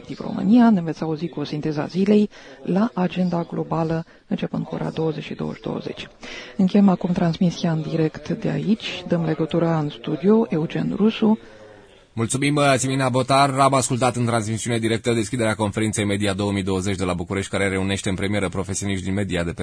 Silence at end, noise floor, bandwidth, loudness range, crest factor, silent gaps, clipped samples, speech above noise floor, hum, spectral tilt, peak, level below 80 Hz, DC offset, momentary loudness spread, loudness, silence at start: 0 s; -47 dBFS; 11 kHz; 4 LU; 16 dB; none; under 0.1%; 26 dB; none; -5.5 dB/octave; -4 dBFS; -50 dBFS; under 0.1%; 10 LU; -22 LUFS; 0 s